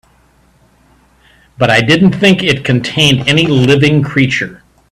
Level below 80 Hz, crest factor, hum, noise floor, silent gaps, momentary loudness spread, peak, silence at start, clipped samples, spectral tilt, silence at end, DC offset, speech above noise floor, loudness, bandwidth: -42 dBFS; 12 dB; none; -50 dBFS; none; 6 LU; 0 dBFS; 1.6 s; under 0.1%; -5.5 dB/octave; 0.35 s; under 0.1%; 40 dB; -10 LUFS; 13.5 kHz